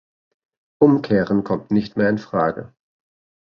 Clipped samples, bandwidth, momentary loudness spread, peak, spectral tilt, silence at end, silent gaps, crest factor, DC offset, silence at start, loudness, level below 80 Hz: under 0.1%; 6.6 kHz; 5 LU; -2 dBFS; -9 dB/octave; 0.75 s; none; 18 dB; under 0.1%; 0.8 s; -19 LUFS; -54 dBFS